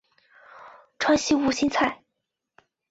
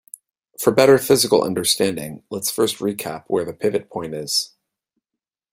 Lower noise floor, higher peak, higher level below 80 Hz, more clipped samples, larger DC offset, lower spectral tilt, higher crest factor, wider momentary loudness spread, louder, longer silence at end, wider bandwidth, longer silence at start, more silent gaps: second, -82 dBFS vs -86 dBFS; second, -8 dBFS vs -2 dBFS; about the same, -58 dBFS vs -60 dBFS; neither; neither; about the same, -3 dB/octave vs -3.5 dB/octave; about the same, 18 dB vs 20 dB; second, 7 LU vs 14 LU; second, -23 LUFS vs -19 LUFS; about the same, 0.95 s vs 1.05 s; second, 8 kHz vs 16 kHz; about the same, 0.55 s vs 0.6 s; neither